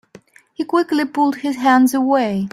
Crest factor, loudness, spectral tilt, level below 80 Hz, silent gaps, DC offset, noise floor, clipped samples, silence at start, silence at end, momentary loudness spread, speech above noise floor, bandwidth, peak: 16 dB; -17 LUFS; -5 dB/octave; -62 dBFS; none; under 0.1%; -47 dBFS; under 0.1%; 0.6 s; 0.05 s; 6 LU; 30 dB; 15 kHz; -2 dBFS